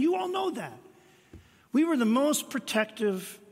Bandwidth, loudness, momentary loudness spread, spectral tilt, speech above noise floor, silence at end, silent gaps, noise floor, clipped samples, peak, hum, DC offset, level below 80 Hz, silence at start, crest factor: 16 kHz; -28 LUFS; 11 LU; -4 dB/octave; 26 dB; 0.15 s; none; -54 dBFS; under 0.1%; -12 dBFS; none; under 0.1%; -70 dBFS; 0 s; 18 dB